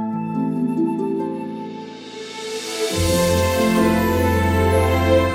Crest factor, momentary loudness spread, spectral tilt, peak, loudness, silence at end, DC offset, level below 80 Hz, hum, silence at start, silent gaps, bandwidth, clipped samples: 14 dB; 14 LU; -5.5 dB/octave; -4 dBFS; -19 LUFS; 0 s; under 0.1%; -34 dBFS; none; 0 s; none; 16.5 kHz; under 0.1%